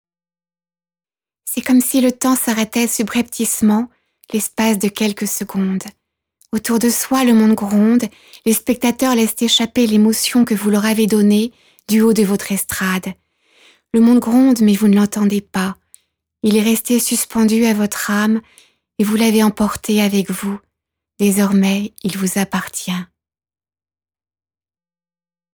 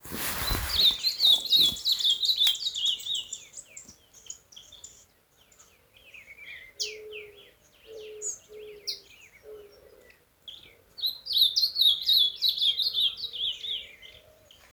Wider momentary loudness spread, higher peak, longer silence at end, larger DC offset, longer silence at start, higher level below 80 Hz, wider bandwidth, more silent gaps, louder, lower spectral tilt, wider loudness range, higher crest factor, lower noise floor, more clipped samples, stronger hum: second, 10 LU vs 24 LU; first, -4 dBFS vs -10 dBFS; first, 2.5 s vs 0.6 s; neither; first, 1.45 s vs 0.05 s; about the same, -54 dBFS vs -52 dBFS; about the same, over 20 kHz vs over 20 kHz; neither; first, -16 LUFS vs -24 LUFS; first, -4.5 dB/octave vs -0.5 dB/octave; second, 5 LU vs 19 LU; second, 14 dB vs 20 dB; first, under -90 dBFS vs -62 dBFS; neither; neither